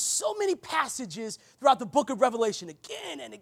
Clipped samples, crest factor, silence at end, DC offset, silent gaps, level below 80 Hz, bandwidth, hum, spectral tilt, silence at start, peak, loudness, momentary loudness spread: under 0.1%; 22 dB; 0.05 s; under 0.1%; none; -74 dBFS; 16.5 kHz; none; -2 dB/octave; 0 s; -8 dBFS; -28 LUFS; 14 LU